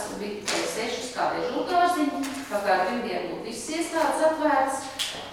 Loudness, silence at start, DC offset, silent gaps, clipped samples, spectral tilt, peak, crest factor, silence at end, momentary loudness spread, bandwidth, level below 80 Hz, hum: -26 LUFS; 0 s; under 0.1%; none; under 0.1%; -2.5 dB/octave; -10 dBFS; 18 dB; 0 s; 8 LU; 16.5 kHz; -60 dBFS; none